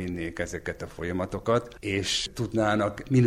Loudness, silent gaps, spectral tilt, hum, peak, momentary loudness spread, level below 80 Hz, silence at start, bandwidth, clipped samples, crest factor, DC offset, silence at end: -28 LUFS; none; -5 dB/octave; none; -10 dBFS; 8 LU; -48 dBFS; 0 s; 14.5 kHz; under 0.1%; 18 dB; under 0.1%; 0 s